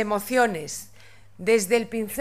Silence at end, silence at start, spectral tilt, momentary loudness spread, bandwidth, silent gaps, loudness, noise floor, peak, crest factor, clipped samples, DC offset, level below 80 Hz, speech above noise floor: 0 s; 0 s; -3.5 dB/octave; 13 LU; 16 kHz; none; -24 LUFS; -51 dBFS; -8 dBFS; 18 dB; under 0.1%; 0.4%; -60 dBFS; 27 dB